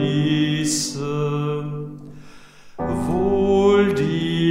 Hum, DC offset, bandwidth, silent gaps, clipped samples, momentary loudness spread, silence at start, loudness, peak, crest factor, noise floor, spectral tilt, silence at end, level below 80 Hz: none; under 0.1%; 16 kHz; none; under 0.1%; 14 LU; 0 s; -20 LUFS; -6 dBFS; 16 dB; -42 dBFS; -5.5 dB/octave; 0 s; -46 dBFS